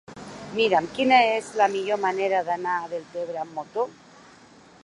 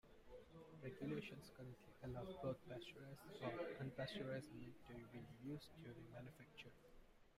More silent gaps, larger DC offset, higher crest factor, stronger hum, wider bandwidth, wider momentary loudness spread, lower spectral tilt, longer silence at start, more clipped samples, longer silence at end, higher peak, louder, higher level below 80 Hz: neither; neither; about the same, 20 dB vs 18 dB; neither; second, 11 kHz vs 15.5 kHz; about the same, 14 LU vs 12 LU; second, -4 dB/octave vs -6.5 dB/octave; about the same, 0.1 s vs 0.05 s; neither; first, 0.9 s vs 0 s; first, -6 dBFS vs -36 dBFS; first, -24 LUFS vs -54 LUFS; first, -66 dBFS vs -72 dBFS